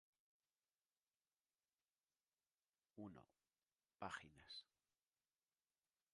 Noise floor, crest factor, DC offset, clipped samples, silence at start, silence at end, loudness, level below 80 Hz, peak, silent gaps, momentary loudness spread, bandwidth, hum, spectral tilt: under -90 dBFS; 30 dB; under 0.1%; under 0.1%; 2.95 s; 1.5 s; -57 LUFS; -88 dBFS; -36 dBFS; none; 12 LU; 10.5 kHz; none; -4 dB/octave